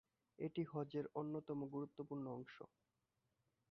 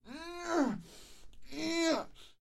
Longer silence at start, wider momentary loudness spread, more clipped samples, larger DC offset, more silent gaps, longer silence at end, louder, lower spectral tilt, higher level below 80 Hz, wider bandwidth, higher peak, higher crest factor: first, 0.4 s vs 0.05 s; second, 10 LU vs 19 LU; neither; neither; neither; first, 1.05 s vs 0.1 s; second, -48 LUFS vs -35 LUFS; first, -7.5 dB/octave vs -3.5 dB/octave; second, -84 dBFS vs -62 dBFS; second, 6 kHz vs 13 kHz; second, -30 dBFS vs -18 dBFS; about the same, 18 dB vs 18 dB